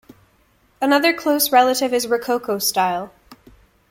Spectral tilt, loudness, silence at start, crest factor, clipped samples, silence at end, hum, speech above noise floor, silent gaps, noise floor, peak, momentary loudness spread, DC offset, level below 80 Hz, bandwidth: -2.5 dB/octave; -18 LUFS; 0.8 s; 18 dB; under 0.1%; 0.55 s; none; 41 dB; none; -59 dBFS; -2 dBFS; 8 LU; under 0.1%; -58 dBFS; 17 kHz